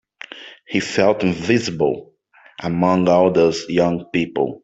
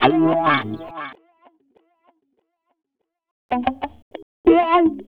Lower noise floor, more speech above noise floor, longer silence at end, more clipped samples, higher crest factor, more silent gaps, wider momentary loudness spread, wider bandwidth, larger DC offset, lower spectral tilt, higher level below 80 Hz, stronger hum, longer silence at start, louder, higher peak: second, -38 dBFS vs -71 dBFS; second, 21 dB vs 52 dB; about the same, 0.05 s vs 0.05 s; neither; second, 16 dB vs 22 dB; second, none vs 3.31-3.49 s, 4.02-4.11 s, 4.22-4.44 s; second, 16 LU vs 20 LU; first, 8 kHz vs 5 kHz; neither; second, -6 dB/octave vs -8.5 dB/octave; about the same, -54 dBFS vs -52 dBFS; neither; first, 0.35 s vs 0 s; about the same, -18 LUFS vs -19 LUFS; about the same, -2 dBFS vs 0 dBFS